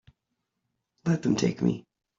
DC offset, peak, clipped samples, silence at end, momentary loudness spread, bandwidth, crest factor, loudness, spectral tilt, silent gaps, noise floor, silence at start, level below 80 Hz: under 0.1%; -12 dBFS; under 0.1%; 0.4 s; 9 LU; 7.6 kHz; 18 dB; -28 LUFS; -6.5 dB/octave; none; -82 dBFS; 1.05 s; -62 dBFS